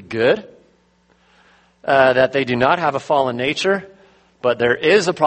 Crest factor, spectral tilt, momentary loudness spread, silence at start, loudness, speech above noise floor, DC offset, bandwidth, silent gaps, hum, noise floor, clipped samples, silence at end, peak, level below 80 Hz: 18 dB; -4.5 dB/octave; 8 LU; 0 s; -17 LUFS; 41 dB; under 0.1%; 8.8 kHz; none; none; -58 dBFS; under 0.1%; 0 s; 0 dBFS; -56 dBFS